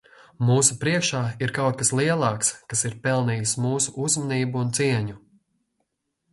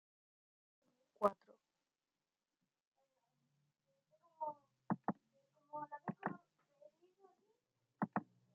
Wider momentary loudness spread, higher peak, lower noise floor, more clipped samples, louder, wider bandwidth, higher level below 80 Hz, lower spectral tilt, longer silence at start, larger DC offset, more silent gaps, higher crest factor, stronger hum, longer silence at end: second, 6 LU vs 14 LU; first, -4 dBFS vs -18 dBFS; second, -76 dBFS vs under -90 dBFS; neither; first, -23 LUFS vs -45 LUFS; first, 11.5 kHz vs 6.8 kHz; first, -58 dBFS vs -88 dBFS; second, -4 dB/octave vs -7.5 dB/octave; second, 0.4 s vs 1.2 s; neither; second, none vs 2.87-2.92 s; second, 20 dB vs 30 dB; neither; first, 1.15 s vs 0.3 s